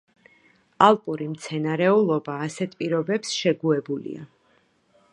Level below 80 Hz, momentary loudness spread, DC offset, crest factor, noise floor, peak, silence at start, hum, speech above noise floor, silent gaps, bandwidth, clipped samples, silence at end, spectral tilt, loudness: -74 dBFS; 13 LU; under 0.1%; 22 dB; -63 dBFS; -2 dBFS; 0.8 s; none; 41 dB; none; 11 kHz; under 0.1%; 0.85 s; -5.5 dB/octave; -23 LUFS